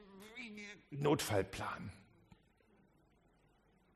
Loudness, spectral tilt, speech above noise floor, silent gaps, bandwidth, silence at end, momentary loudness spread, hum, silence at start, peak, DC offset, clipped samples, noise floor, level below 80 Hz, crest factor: -40 LUFS; -5 dB/octave; 33 dB; none; 13 kHz; 1.9 s; 17 LU; none; 0 s; -22 dBFS; under 0.1%; under 0.1%; -72 dBFS; -68 dBFS; 22 dB